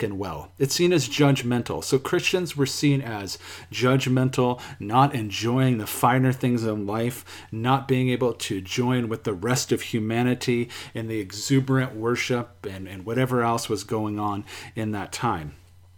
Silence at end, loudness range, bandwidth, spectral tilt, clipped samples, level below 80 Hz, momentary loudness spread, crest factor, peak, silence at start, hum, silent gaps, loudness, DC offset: 0.4 s; 3 LU; 18.5 kHz; -5.5 dB/octave; under 0.1%; -58 dBFS; 11 LU; 20 dB; -6 dBFS; 0 s; none; none; -24 LUFS; under 0.1%